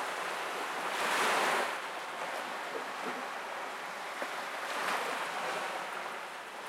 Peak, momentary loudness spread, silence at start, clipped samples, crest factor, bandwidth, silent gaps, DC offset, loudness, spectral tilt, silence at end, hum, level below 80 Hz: -18 dBFS; 10 LU; 0 s; under 0.1%; 18 dB; 16.5 kHz; none; under 0.1%; -35 LUFS; -1 dB/octave; 0 s; none; -86 dBFS